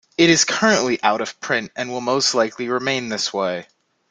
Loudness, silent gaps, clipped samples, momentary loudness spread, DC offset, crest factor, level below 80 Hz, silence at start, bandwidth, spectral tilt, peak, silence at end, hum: -19 LUFS; none; under 0.1%; 10 LU; under 0.1%; 20 dB; -62 dBFS; 0.2 s; 9.6 kHz; -2.5 dB/octave; 0 dBFS; 0.5 s; none